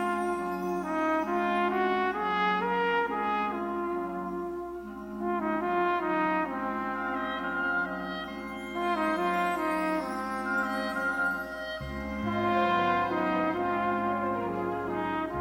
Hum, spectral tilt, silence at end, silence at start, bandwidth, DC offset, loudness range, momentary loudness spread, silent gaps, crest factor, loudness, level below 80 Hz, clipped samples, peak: none; -6 dB/octave; 0 s; 0 s; 16.5 kHz; under 0.1%; 3 LU; 9 LU; none; 16 dB; -30 LUFS; -54 dBFS; under 0.1%; -14 dBFS